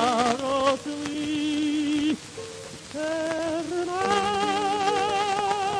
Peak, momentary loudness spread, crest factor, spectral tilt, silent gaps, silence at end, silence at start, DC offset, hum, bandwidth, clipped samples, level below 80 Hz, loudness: -8 dBFS; 9 LU; 18 dB; -3.5 dB/octave; none; 0 s; 0 s; under 0.1%; none; 11 kHz; under 0.1%; -60 dBFS; -25 LUFS